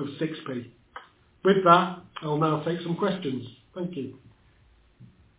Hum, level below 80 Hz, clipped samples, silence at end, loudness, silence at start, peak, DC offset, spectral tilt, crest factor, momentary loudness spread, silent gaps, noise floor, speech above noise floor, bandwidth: none; -66 dBFS; under 0.1%; 0.35 s; -26 LUFS; 0 s; -2 dBFS; under 0.1%; -10.5 dB/octave; 24 dB; 23 LU; none; -60 dBFS; 34 dB; 4 kHz